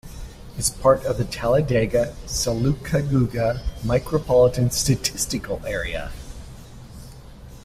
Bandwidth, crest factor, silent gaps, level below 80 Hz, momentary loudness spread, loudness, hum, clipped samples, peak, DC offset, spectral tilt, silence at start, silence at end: 16 kHz; 20 dB; none; -36 dBFS; 22 LU; -22 LUFS; none; under 0.1%; -4 dBFS; under 0.1%; -5 dB/octave; 0.05 s; 0 s